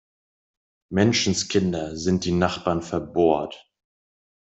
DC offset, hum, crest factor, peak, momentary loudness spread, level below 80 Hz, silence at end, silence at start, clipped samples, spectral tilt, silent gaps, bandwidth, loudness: under 0.1%; none; 20 dB; -4 dBFS; 7 LU; -54 dBFS; 0.85 s; 0.9 s; under 0.1%; -5 dB/octave; none; 8.2 kHz; -23 LUFS